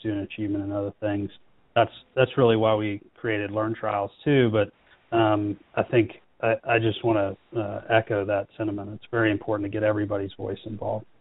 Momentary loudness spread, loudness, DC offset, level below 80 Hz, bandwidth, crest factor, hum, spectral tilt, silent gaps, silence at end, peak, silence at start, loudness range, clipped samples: 10 LU; -26 LUFS; under 0.1%; -58 dBFS; 4 kHz; 20 dB; none; -5.5 dB/octave; none; 0.15 s; -4 dBFS; 0.05 s; 2 LU; under 0.1%